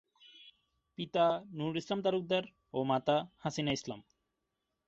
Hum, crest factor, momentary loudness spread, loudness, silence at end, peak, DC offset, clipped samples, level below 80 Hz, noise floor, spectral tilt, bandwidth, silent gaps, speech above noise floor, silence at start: none; 20 dB; 17 LU; -34 LUFS; 0.85 s; -16 dBFS; under 0.1%; under 0.1%; -72 dBFS; -85 dBFS; -4 dB/octave; 7.6 kHz; none; 51 dB; 0.35 s